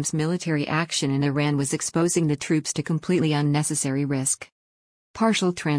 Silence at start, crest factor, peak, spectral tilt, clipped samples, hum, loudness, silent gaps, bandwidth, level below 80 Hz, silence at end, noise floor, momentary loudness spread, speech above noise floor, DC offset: 0 s; 14 dB; -10 dBFS; -4.5 dB/octave; under 0.1%; none; -23 LUFS; 4.52-5.14 s; 10.5 kHz; -60 dBFS; 0 s; under -90 dBFS; 4 LU; over 67 dB; under 0.1%